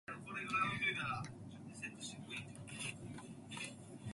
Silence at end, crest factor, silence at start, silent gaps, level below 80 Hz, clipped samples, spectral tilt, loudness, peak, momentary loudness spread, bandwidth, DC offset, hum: 0 s; 20 dB; 0.1 s; none; -70 dBFS; under 0.1%; -3.5 dB/octave; -43 LUFS; -26 dBFS; 14 LU; 11.5 kHz; under 0.1%; none